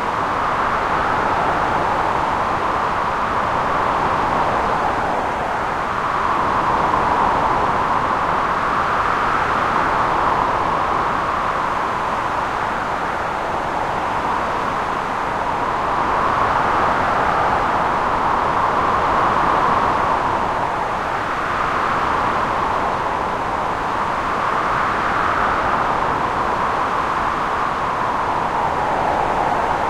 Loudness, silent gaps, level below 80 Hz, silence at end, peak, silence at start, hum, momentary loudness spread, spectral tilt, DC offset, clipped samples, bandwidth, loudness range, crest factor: -19 LUFS; none; -38 dBFS; 0 s; -4 dBFS; 0 s; none; 4 LU; -5 dB/octave; under 0.1%; under 0.1%; 15 kHz; 3 LU; 16 dB